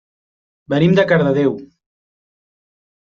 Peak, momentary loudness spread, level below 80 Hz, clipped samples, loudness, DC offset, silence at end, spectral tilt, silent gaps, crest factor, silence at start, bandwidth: -2 dBFS; 9 LU; -54 dBFS; under 0.1%; -15 LUFS; under 0.1%; 1.5 s; -8 dB/octave; none; 18 dB; 0.7 s; 6.8 kHz